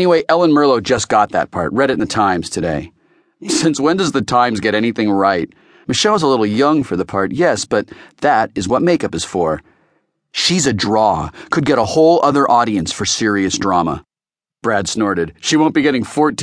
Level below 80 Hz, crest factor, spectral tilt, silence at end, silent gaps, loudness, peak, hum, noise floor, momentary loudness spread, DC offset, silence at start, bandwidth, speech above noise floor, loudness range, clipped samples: -46 dBFS; 14 dB; -4.5 dB/octave; 0 s; none; -15 LUFS; 0 dBFS; none; under -90 dBFS; 8 LU; under 0.1%; 0 s; 10.5 kHz; over 75 dB; 3 LU; under 0.1%